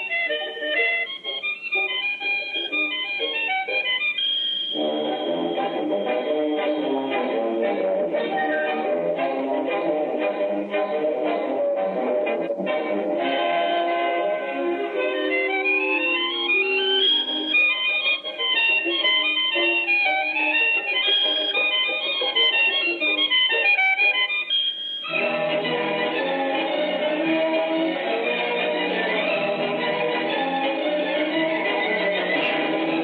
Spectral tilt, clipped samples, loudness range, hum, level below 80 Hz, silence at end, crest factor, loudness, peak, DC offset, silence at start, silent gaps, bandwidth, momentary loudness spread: -5.5 dB/octave; under 0.1%; 5 LU; none; -80 dBFS; 0 s; 14 dB; -21 LUFS; -10 dBFS; under 0.1%; 0 s; none; 5.2 kHz; 7 LU